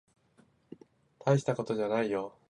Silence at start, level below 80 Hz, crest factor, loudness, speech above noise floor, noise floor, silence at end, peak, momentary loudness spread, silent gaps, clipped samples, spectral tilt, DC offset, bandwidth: 1.25 s; -74 dBFS; 22 dB; -31 LUFS; 36 dB; -66 dBFS; 0.2 s; -12 dBFS; 7 LU; none; under 0.1%; -7 dB/octave; under 0.1%; 10.5 kHz